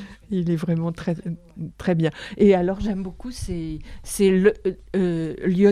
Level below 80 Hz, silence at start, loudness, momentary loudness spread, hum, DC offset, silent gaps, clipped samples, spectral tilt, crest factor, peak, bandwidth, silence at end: -42 dBFS; 0 s; -23 LUFS; 16 LU; none; under 0.1%; none; under 0.1%; -7 dB/octave; 18 dB; -4 dBFS; 14.5 kHz; 0 s